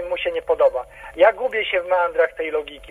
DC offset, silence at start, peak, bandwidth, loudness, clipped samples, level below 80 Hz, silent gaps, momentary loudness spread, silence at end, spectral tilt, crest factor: under 0.1%; 0 s; -4 dBFS; 11.5 kHz; -20 LUFS; under 0.1%; -50 dBFS; none; 9 LU; 0 s; -4 dB/octave; 18 dB